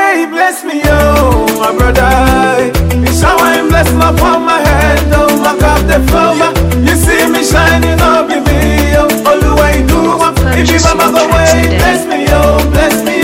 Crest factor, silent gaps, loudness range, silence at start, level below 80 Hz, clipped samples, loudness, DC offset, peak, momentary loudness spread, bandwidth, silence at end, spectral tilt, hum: 8 dB; none; 0 LU; 0 s; -16 dBFS; 0.5%; -8 LUFS; under 0.1%; 0 dBFS; 3 LU; 16.5 kHz; 0 s; -5 dB/octave; none